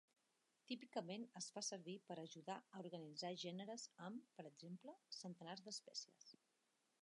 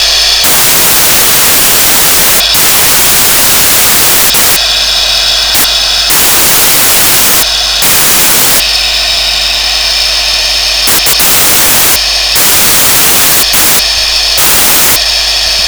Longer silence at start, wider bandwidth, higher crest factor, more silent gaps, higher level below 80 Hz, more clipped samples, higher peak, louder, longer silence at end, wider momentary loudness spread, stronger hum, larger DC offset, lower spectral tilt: first, 0.7 s vs 0 s; second, 11 kHz vs over 20 kHz; first, 22 dB vs 6 dB; neither; second, under -90 dBFS vs -28 dBFS; second, under 0.1% vs 0.4%; second, -34 dBFS vs 0 dBFS; second, -53 LUFS vs -3 LUFS; first, 0.7 s vs 0 s; first, 9 LU vs 4 LU; neither; neither; first, -3.5 dB/octave vs 0 dB/octave